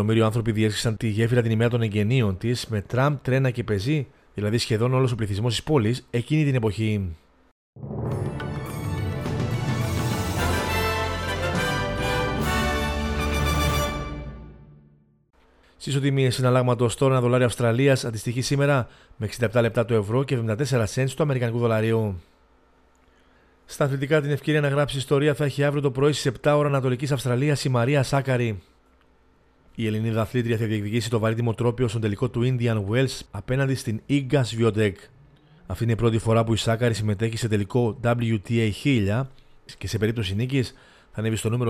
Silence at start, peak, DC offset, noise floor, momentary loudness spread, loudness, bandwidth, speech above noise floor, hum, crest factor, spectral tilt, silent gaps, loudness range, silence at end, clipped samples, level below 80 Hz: 0 s; -8 dBFS; under 0.1%; -59 dBFS; 8 LU; -24 LUFS; 16 kHz; 36 dB; none; 16 dB; -6 dB/octave; 7.51-7.73 s; 4 LU; 0 s; under 0.1%; -42 dBFS